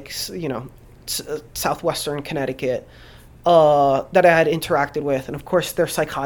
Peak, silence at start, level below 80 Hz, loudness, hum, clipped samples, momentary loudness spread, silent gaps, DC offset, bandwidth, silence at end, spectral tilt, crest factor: -2 dBFS; 0 s; -48 dBFS; -20 LUFS; none; under 0.1%; 13 LU; none; under 0.1%; 19 kHz; 0 s; -4.5 dB/octave; 18 dB